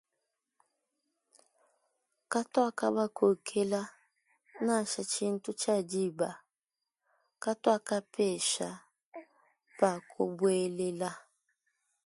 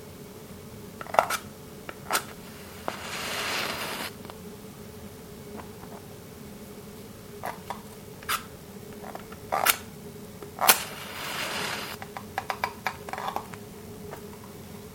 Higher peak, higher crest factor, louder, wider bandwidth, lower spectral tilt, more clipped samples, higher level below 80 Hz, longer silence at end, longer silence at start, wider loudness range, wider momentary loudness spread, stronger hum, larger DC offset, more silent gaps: second, -12 dBFS vs 0 dBFS; second, 22 dB vs 34 dB; about the same, -32 LUFS vs -30 LUFS; second, 11.5 kHz vs 17 kHz; first, -4 dB/octave vs -2 dB/octave; neither; second, -80 dBFS vs -58 dBFS; first, 0.85 s vs 0 s; first, 2.3 s vs 0 s; second, 2 LU vs 14 LU; second, 13 LU vs 19 LU; neither; neither; first, 9.06-9.12 s vs none